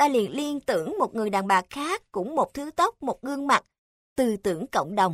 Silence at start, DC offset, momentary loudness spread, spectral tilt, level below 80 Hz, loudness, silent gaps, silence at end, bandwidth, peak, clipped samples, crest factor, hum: 0 s; under 0.1%; 7 LU; -4.5 dB/octave; -60 dBFS; -26 LUFS; 3.78-4.16 s; 0 s; 16 kHz; -6 dBFS; under 0.1%; 18 dB; none